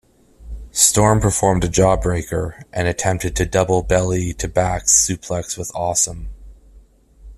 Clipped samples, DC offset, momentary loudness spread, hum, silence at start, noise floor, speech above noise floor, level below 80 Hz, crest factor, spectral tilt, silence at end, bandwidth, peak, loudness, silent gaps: under 0.1%; under 0.1%; 12 LU; none; 0.4 s; -48 dBFS; 30 dB; -34 dBFS; 18 dB; -4 dB/octave; 0 s; 14 kHz; 0 dBFS; -17 LUFS; none